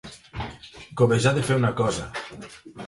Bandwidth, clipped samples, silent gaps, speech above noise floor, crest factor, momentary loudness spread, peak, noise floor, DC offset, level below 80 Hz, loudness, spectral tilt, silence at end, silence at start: 11.5 kHz; under 0.1%; none; 19 dB; 18 dB; 20 LU; -6 dBFS; -42 dBFS; under 0.1%; -48 dBFS; -23 LUFS; -5.5 dB/octave; 0 s; 0.05 s